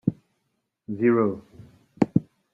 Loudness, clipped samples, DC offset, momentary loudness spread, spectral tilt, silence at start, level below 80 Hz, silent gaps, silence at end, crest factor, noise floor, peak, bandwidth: -24 LUFS; under 0.1%; under 0.1%; 14 LU; -10 dB/octave; 0.05 s; -60 dBFS; none; 0.3 s; 24 dB; -76 dBFS; -2 dBFS; 7.6 kHz